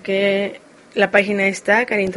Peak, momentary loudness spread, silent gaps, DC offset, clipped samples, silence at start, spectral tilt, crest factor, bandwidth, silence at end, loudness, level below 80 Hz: 0 dBFS; 9 LU; none; under 0.1%; under 0.1%; 0.05 s; -4.5 dB/octave; 18 dB; 11.5 kHz; 0 s; -18 LUFS; -58 dBFS